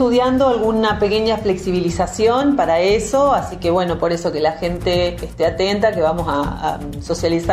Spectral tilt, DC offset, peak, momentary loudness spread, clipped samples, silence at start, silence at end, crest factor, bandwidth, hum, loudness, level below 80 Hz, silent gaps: -5.5 dB/octave; under 0.1%; -4 dBFS; 6 LU; under 0.1%; 0 s; 0 s; 14 dB; 15 kHz; none; -18 LUFS; -36 dBFS; none